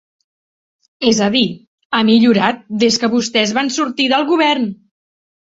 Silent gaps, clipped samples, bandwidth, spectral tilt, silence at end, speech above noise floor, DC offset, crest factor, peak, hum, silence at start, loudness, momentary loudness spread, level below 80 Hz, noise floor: 1.67-1.78 s, 1.85-1.90 s; under 0.1%; 8 kHz; -4 dB/octave; 0.85 s; over 76 dB; under 0.1%; 16 dB; 0 dBFS; none; 1 s; -15 LUFS; 8 LU; -58 dBFS; under -90 dBFS